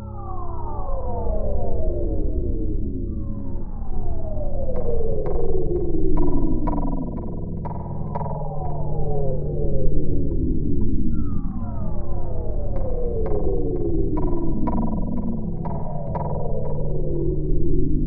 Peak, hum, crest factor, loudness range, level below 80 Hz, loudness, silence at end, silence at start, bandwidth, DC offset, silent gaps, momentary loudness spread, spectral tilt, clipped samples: -4 dBFS; none; 14 dB; 3 LU; -24 dBFS; -27 LUFS; 0 s; 0 s; 1.4 kHz; under 0.1%; none; 6 LU; -13.5 dB/octave; under 0.1%